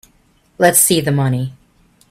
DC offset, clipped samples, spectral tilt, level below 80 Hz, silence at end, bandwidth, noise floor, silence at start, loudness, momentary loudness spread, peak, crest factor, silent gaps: under 0.1%; under 0.1%; -4 dB/octave; -50 dBFS; 0.6 s; 16 kHz; -55 dBFS; 0.6 s; -13 LUFS; 12 LU; 0 dBFS; 18 dB; none